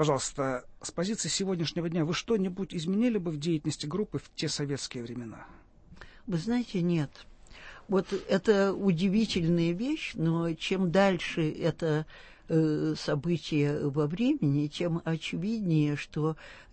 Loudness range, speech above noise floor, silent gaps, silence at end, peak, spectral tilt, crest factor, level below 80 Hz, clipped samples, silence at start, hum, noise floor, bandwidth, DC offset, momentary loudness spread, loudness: 6 LU; 22 dB; none; 0.1 s; -10 dBFS; -5.5 dB/octave; 18 dB; -56 dBFS; under 0.1%; 0 s; none; -51 dBFS; 8.8 kHz; under 0.1%; 9 LU; -30 LUFS